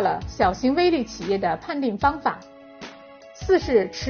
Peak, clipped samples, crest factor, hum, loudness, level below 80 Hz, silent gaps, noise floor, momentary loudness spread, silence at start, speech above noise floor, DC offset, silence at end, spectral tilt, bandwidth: -6 dBFS; under 0.1%; 18 dB; none; -23 LUFS; -44 dBFS; none; -45 dBFS; 20 LU; 0 s; 22 dB; under 0.1%; 0 s; -4 dB/octave; 6.8 kHz